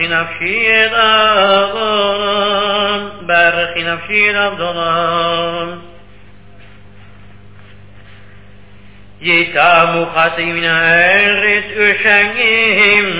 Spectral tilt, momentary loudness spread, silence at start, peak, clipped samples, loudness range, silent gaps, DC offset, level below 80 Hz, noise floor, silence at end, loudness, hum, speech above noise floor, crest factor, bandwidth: -7 dB/octave; 8 LU; 0 s; 0 dBFS; under 0.1%; 10 LU; none; 1%; -48 dBFS; -41 dBFS; 0 s; -11 LUFS; 50 Hz at -45 dBFS; 28 dB; 14 dB; 4 kHz